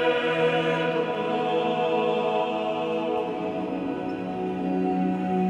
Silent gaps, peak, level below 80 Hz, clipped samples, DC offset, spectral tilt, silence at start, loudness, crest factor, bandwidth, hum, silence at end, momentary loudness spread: none; -12 dBFS; -62 dBFS; under 0.1%; under 0.1%; -7 dB/octave; 0 s; -26 LUFS; 14 dB; 9.4 kHz; none; 0 s; 7 LU